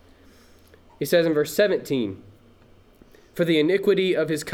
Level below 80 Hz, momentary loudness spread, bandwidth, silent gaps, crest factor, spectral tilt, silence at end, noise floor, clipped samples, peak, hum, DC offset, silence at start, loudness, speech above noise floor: -60 dBFS; 12 LU; 19 kHz; none; 16 dB; -5 dB/octave; 0 s; -53 dBFS; under 0.1%; -8 dBFS; none; under 0.1%; 1 s; -22 LUFS; 32 dB